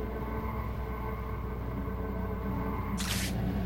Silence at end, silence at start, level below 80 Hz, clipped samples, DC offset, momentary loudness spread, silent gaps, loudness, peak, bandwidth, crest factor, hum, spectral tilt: 0 s; 0 s; -38 dBFS; under 0.1%; under 0.1%; 5 LU; none; -35 LUFS; -18 dBFS; 16.5 kHz; 14 dB; none; -5.5 dB/octave